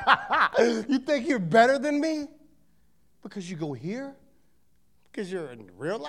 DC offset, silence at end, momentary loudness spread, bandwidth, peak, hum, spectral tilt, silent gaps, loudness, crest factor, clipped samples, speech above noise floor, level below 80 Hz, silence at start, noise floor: 0.1%; 0 s; 21 LU; 12.5 kHz; -4 dBFS; none; -5 dB/octave; none; -25 LUFS; 24 dB; under 0.1%; 43 dB; -66 dBFS; 0 s; -69 dBFS